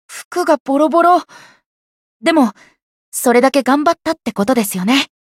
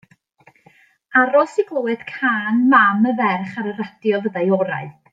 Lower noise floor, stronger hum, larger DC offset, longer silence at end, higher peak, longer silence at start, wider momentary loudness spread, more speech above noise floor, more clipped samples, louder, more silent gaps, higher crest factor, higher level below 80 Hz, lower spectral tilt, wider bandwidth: first, under -90 dBFS vs -54 dBFS; neither; neither; about the same, 0.2 s vs 0.2 s; about the same, 0 dBFS vs -2 dBFS; second, 0.1 s vs 1.1 s; second, 8 LU vs 12 LU; first, over 76 dB vs 37 dB; neither; first, -14 LUFS vs -18 LUFS; first, 0.25-0.31 s, 0.60-0.65 s, 1.66-2.20 s, 2.82-3.12 s vs none; about the same, 16 dB vs 18 dB; first, -60 dBFS vs -72 dBFS; second, -4 dB/octave vs -7 dB/octave; first, 16.5 kHz vs 7.8 kHz